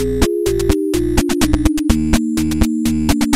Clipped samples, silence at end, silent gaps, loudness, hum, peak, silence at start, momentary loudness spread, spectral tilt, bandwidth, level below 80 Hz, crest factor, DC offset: under 0.1%; 0 s; none; -16 LUFS; none; 0 dBFS; 0 s; 2 LU; -5.5 dB/octave; 16.5 kHz; -22 dBFS; 14 dB; under 0.1%